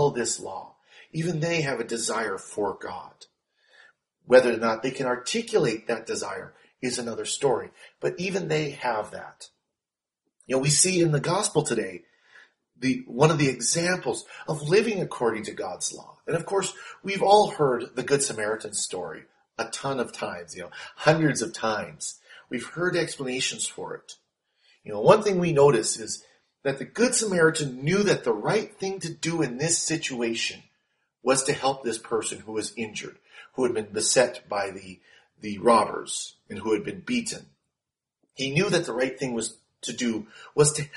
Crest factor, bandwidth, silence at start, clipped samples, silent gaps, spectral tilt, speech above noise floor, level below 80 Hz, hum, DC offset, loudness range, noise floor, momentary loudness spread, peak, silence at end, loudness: 24 dB; 11.5 kHz; 0 s; under 0.1%; none; -4 dB/octave; 64 dB; -66 dBFS; none; under 0.1%; 5 LU; -90 dBFS; 16 LU; -2 dBFS; 0 s; -25 LUFS